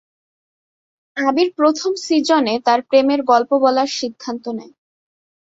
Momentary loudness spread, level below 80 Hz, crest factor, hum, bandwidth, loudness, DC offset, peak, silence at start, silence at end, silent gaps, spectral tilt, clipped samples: 12 LU; -66 dBFS; 16 dB; none; 8 kHz; -17 LUFS; under 0.1%; -2 dBFS; 1.15 s; 0.95 s; none; -3 dB/octave; under 0.1%